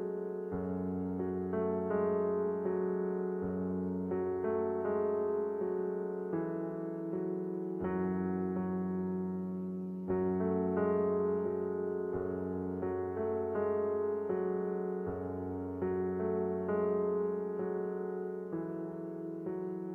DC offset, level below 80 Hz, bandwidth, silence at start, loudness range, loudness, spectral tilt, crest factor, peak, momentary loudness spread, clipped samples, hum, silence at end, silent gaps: under 0.1%; -70 dBFS; 3 kHz; 0 s; 2 LU; -35 LUFS; -11.5 dB/octave; 14 dB; -22 dBFS; 7 LU; under 0.1%; none; 0 s; none